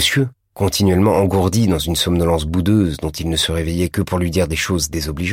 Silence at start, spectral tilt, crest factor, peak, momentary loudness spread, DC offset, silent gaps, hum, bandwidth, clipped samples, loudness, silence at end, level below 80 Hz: 0 s; -5 dB/octave; 14 dB; -4 dBFS; 6 LU; under 0.1%; none; none; 16.5 kHz; under 0.1%; -17 LUFS; 0 s; -32 dBFS